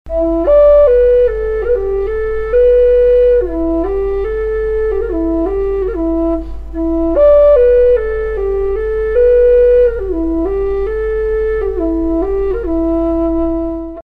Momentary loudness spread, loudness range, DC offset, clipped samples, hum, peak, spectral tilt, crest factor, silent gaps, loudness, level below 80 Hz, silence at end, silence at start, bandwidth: 9 LU; 5 LU; under 0.1%; under 0.1%; none; 0 dBFS; -9.5 dB/octave; 12 dB; none; -13 LUFS; -26 dBFS; 0.05 s; 0.05 s; 4.6 kHz